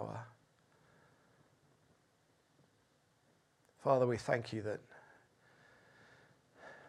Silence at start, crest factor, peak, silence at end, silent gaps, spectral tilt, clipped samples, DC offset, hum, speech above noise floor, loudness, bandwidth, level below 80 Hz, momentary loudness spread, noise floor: 0 s; 26 dB; -18 dBFS; 0 s; none; -6.5 dB/octave; under 0.1%; under 0.1%; none; 39 dB; -37 LUFS; 12 kHz; -80 dBFS; 26 LU; -74 dBFS